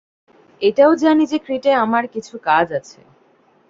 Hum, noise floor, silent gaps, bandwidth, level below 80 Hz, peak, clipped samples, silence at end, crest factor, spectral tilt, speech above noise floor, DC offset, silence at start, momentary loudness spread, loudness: none; -55 dBFS; none; 7.6 kHz; -62 dBFS; -2 dBFS; under 0.1%; 0.9 s; 16 dB; -5.5 dB/octave; 39 dB; under 0.1%; 0.6 s; 11 LU; -17 LUFS